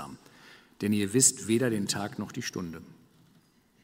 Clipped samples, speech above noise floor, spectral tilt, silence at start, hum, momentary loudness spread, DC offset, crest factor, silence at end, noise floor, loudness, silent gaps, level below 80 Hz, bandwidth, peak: under 0.1%; 35 dB; -3.5 dB/octave; 0 s; none; 18 LU; under 0.1%; 22 dB; 0.9 s; -64 dBFS; -27 LUFS; none; -68 dBFS; 16 kHz; -8 dBFS